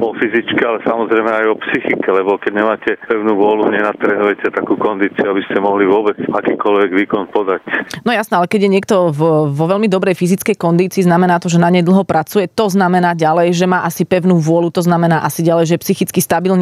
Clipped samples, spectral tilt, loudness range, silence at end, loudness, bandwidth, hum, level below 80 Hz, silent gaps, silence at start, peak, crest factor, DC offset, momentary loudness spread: under 0.1%; -6 dB/octave; 2 LU; 0 s; -14 LUFS; 15.5 kHz; none; -60 dBFS; none; 0 s; -2 dBFS; 12 dB; under 0.1%; 4 LU